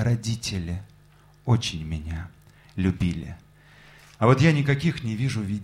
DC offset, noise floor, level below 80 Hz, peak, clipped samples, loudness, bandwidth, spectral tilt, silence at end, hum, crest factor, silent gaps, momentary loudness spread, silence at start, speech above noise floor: under 0.1%; -54 dBFS; -44 dBFS; -4 dBFS; under 0.1%; -25 LUFS; 12.5 kHz; -6 dB/octave; 0 s; 50 Hz at -55 dBFS; 22 dB; none; 17 LU; 0 s; 31 dB